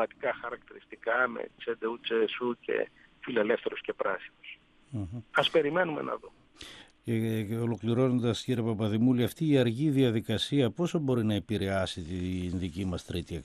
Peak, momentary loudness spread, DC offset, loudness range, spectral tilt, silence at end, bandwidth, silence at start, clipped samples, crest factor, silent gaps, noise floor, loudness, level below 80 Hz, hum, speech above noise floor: -6 dBFS; 14 LU; under 0.1%; 5 LU; -6.5 dB/octave; 0 s; 13.5 kHz; 0 s; under 0.1%; 24 dB; none; -50 dBFS; -30 LUFS; -62 dBFS; none; 20 dB